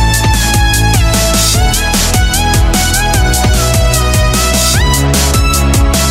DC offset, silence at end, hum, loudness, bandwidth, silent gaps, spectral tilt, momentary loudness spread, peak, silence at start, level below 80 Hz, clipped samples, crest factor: under 0.1%; 0 s; none; -10 LUFS; 16.5 kHz; none; -3.5 dB/octave; 1 LU; 0 dBFS; 0 s; -14 dBFS; under 0.1%; 10 dB